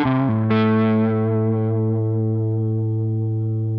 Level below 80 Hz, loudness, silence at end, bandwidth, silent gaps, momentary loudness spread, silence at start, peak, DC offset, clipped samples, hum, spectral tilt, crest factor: -56 dBFS; -20 LUFS; 0 s; 4.9 kHz; none; 5 LU; 0 s; -6 dBFS; under 0.1%; under 0.1%; none; -11.5 dB/octave; 14 dB